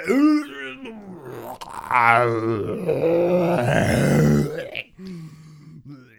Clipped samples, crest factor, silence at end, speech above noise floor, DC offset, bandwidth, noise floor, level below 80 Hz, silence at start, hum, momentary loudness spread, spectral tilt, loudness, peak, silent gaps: under 0.1%; 22 dB; 0.2 s; 25 dB; under 0.1%; 19 kHz; -44 dBFS; -46 dBFS; 0 s; none; 20 LU; -6.5 dB/octave; -19 LUFS; 0 dBFS; none